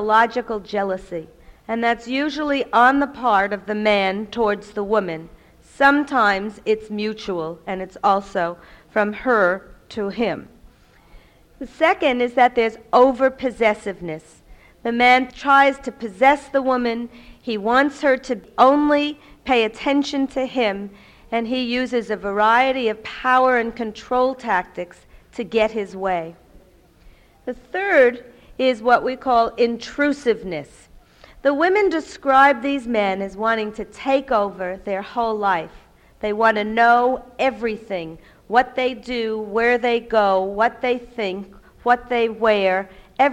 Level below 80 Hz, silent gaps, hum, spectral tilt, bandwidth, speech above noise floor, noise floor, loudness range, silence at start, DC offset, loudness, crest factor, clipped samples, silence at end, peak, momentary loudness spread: -50 dBFS; none; none; -5 dB/octave; 11.5 kHz; 31 dB; -51 dBFS; 4 LU; 0 s; under 0.1%; -20 LUFS; 18 dB; under 0.1%; 0 s; -2 dBFS; 14 LU